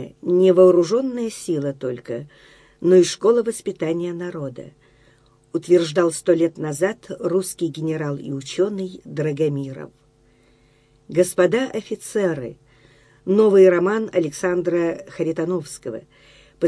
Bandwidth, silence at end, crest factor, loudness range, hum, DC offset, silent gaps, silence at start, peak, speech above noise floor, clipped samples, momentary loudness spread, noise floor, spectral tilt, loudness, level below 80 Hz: 11 kHz; 0 s; 18 dB; 6 LU; none; under 0.1%; none; 0 s; -2 dBFS; 37 dB; under 0.1%; 16 LU; -57 dBFS; -6 dB/octave; -20 LUFS; -62 dBFS